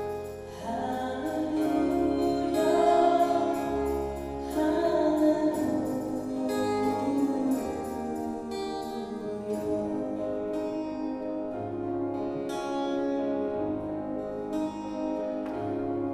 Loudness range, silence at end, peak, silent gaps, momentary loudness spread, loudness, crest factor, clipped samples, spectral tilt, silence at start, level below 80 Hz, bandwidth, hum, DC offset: 7 LU; 0 s; -12 dBFS; none; 10 LU; -29 LUFS; 18 dB; under 0.1%; -6.5 dB/octave; 0 s; -52 dBFS; 15 kHz; none; under 0.1%